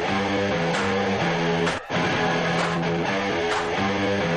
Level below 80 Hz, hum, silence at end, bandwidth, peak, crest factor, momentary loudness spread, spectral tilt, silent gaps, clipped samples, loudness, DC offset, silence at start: -50 dBFS; none; 0 s; 10.5 kHz; -12 dBFS; 10 dB; 2 LU; -5 dB/octave; none; under 0.1%; -23 LUFS; under 0.1%; 0 s